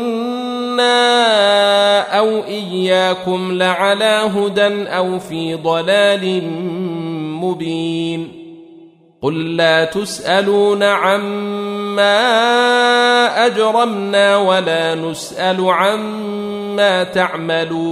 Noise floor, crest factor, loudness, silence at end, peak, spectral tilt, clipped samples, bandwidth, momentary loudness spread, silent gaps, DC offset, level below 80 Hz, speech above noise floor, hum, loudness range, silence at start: -43 dBFS; 14 dB; -15 LUFS; 0 s; -2 dBFS; -4 dB/octave; under 0.1%; 14 kHz; 10 LU; none; under 0.1%; -60 dBFS; 28 dB; none; 6 LU; 0 s